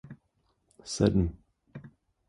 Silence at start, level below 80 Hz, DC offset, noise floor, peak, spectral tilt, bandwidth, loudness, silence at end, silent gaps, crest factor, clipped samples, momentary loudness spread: 0.05 s; -46 dBFS; under 0.1%; -73 dBFS; -10 dBFS; -6.5 dB/octave; 11.5 kHz; -28 LUFS; 0.4 s; none; 22 dB; under 0.1%; 24 LU